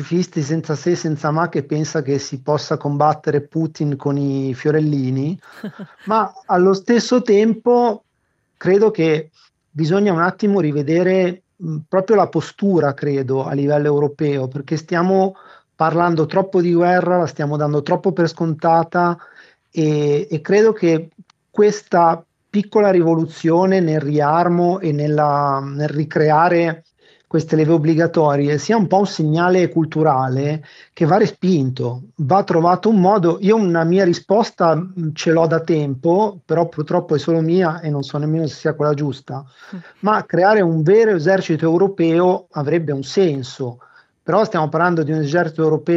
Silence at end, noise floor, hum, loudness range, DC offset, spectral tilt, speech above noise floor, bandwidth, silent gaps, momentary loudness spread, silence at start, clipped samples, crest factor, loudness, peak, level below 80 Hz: 0 s; -67 dBFS; none; 4 LU; under 0.1%; -7 dB/octave; 51 dB; 7.8 kHz; none; 8 LU; 0 s; under 0.1%; 16 dB; -17 LUFS; 0 dBFS; -66 dBFS